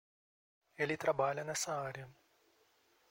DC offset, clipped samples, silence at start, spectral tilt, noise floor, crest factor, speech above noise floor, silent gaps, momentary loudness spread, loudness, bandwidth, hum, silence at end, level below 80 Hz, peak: under 0.1%; under 0.1%; 0.8 s; -3.5 dB/octave; -72 dBFS; 20 dB; 35 dB; none; 14 LU; -37 LUFS; 16 kHz; none; 1 s; -76 dBFS; -20 dBFS